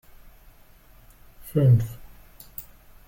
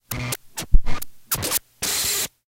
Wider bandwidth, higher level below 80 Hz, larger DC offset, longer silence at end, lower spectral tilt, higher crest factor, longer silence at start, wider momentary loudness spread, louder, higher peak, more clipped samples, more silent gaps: about the same, 17 kHz vs 17 kHz; second, -48 dBFS vs -24 dBFS; neither; first, 0.45 s vs 0.25 s; first, -9 dB/octave vs -2 dB/octave; about the same, 18 dB vs 20 dB; first, 1.45 s vs 0.1 s; first, 26 LU vs 9 LU; about the same, -22 LUFS vs -24 LUFS; second, -10 dBFS vs 0 dBFS; neither; neither